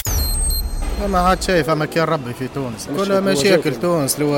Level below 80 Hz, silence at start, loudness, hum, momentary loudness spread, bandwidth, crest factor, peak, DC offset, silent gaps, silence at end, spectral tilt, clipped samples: -26 dBFS; 0.05 s; -18 LUFS; none; 10 LU; 17 kHz; 16 dB; -2 dBFS; under 0.1%; none; 0 s; -4.5 dB/octave; under 0.1%